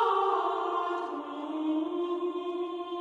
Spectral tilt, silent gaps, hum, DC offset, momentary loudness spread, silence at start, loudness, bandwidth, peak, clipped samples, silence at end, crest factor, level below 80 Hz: -4.5 dB/octave; none; none; under 0.1%; 8 LU; 0 s; -31 LUFS; 7.8 kHz; -16 dBFS; under 0.1%; 0 s; 16 dB; -80 dBFS